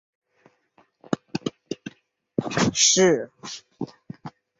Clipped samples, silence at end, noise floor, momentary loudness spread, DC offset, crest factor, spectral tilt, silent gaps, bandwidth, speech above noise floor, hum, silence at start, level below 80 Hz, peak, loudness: under 0.1%; 0.3 s; -63 dBFS; 24 LU; under 0.1%; 22 dB; -3 dB/octave; none; 8 kHz; 40 dB; none; 1.1 s; -60 dBFS; -4 dBFS; -22 LUFS